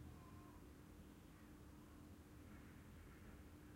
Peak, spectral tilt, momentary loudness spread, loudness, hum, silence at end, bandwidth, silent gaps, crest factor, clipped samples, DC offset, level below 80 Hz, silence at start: -46 dBFS; -6 dB/octave; 2 LU; -62 LUFS; none; 0 s; 16 kHz; none; 14 dB; under 0.1%; under 0.1%; -68 dBFS; 0 s